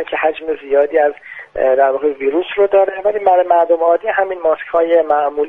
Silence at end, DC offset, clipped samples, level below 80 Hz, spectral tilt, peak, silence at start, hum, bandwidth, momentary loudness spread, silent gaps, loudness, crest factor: 0 s; under 0.1%; under 0.1%; -54 dBFS; -6 dB/octave; 0 dBFS; 0 s; none; 3.9 kHz; 6 LU; none; -15 LUFS; 14 dB